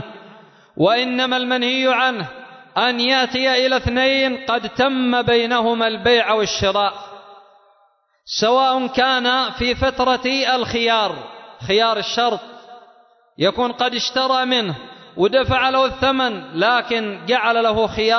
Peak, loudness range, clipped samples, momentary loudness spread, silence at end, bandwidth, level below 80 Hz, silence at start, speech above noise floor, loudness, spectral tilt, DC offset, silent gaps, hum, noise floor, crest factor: -4 dBFS; 3 LU; under 0.1%; 8 LU; 0 s; 6.4 kHz; -44 dBFS; 0 s; 42 dB; -18 LUFS; -4 dB/octave; under 0.1%; none; none; -60 dBFS; 14 dB